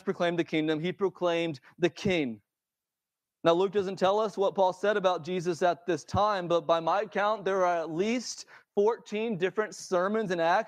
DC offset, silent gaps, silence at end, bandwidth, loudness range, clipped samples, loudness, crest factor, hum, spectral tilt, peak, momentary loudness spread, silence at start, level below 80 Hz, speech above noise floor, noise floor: under 0.1%; none; 0 s; 11.5 kHz; 3 LU; under 0.1%; -29 LUFS; 18 dB; none; -5 dB/octave; -10 dBFS; 6 LU; 0.05 s; -68 dBFS; over 62 dB; under -90 dBFS